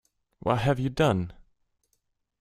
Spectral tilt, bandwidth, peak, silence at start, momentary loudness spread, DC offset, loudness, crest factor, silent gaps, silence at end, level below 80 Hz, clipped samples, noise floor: -7 dB/octave; 14.5 kHz; -8 dBFS; 0.45 s; 10 LU; under 0.1%; -26 LUFS; 22 dB; none; 1.1 s; -52 dBFS; under 0.1%; -76 dBFS